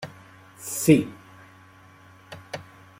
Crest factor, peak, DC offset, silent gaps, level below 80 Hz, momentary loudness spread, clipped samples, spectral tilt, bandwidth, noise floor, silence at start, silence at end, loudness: 24 dB; -2 dBFS; under 0.1%; none; -62 dBFS; 25 LU; under 0.1%; -5.5 dB/octave; 16.5 kHz; -51 dBFS; 0 s; 0.4 s; -22 LUFS